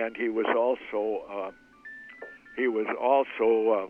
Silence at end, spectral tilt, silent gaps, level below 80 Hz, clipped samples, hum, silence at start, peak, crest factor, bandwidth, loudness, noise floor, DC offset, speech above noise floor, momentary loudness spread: 0 s; -6.5 dB/octave; none; -70 dBFS; under 0.1%; none; 0 s; -10 dBFS; 18 dB; 4.4 kHz; -27 LUFS; -47 dBFS; under 0.1%; 20 dB; 20 LU